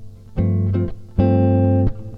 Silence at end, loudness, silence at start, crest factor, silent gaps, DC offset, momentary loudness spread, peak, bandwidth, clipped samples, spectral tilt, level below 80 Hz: 0 s; -19 LUFS; 0 s; 14 dB; none; under 0.1%; 8 LU; -4 dBFS; 3.6 kHz; under 0.1%; -12 dB/octave; -32 dBFS